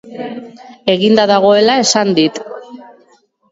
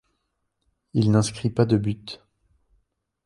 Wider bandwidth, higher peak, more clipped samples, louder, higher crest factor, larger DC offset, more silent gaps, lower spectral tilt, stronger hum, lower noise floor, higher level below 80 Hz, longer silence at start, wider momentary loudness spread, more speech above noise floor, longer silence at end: second, 8 kHz vs 11.5 kHz; first, 0 dBFS vs -6 dBFS; neither; first, -11 LUFS vs -23 LUFS; second, 14 dB vs 20 dB; neither; neither; second, -3.5 dB/octave vs -6.5 dB/octave; neither; second, -52 dBFS vs -76 dBFS; second, -60 dBFS vs -54 dBFS; second, 0.05 s vs 0.95 s; first, 19 LU vs 16 LU; second, 40 dB vs 54 dB; second, 0.7 s vs 1.1 s